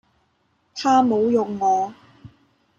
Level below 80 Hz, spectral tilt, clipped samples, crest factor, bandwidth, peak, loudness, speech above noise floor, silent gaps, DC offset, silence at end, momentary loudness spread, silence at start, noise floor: -64 dBFS; -5.5 dB/octave; under 0.1%; 16 dB; 7.6 kHz; -6 dBFS; -20 LUFS; 48 dB; none; under 0.1%; 0.5 s; 11 LU; 0.75 s; -66 dBFS